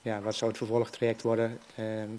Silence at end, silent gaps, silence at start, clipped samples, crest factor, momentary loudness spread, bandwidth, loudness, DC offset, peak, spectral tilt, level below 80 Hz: 0 s; none; 0.05 s; under 0.1%; 16 dB; 7 LU; 11 kHz; -31 LUFS; under 0.1%; -14 dBFS; -5.5 dB/octave; -74 dBFS